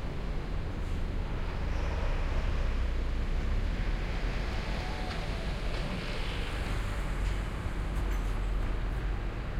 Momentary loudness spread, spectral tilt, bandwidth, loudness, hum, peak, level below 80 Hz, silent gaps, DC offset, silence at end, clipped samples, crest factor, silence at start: 3 LU; -6 dB/octave; 11.5 kHz; -35 LUFS; none; -18 dBFS; -32 dBFS; none; under 0.1%; 0 s; under 0.1%; 12 dB; 0 s